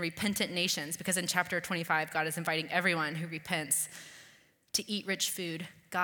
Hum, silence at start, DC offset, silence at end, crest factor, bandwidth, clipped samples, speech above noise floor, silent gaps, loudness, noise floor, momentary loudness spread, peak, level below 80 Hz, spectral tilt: none; 0 s; under 0.1%; 0 s; 22 dB; 19 kHz; under 0.1%; 29 dB; none; -32 LUFS; -62 dBFS; 9 LU; -12 dBFS; -72 dBFS; -2.5 dB/octave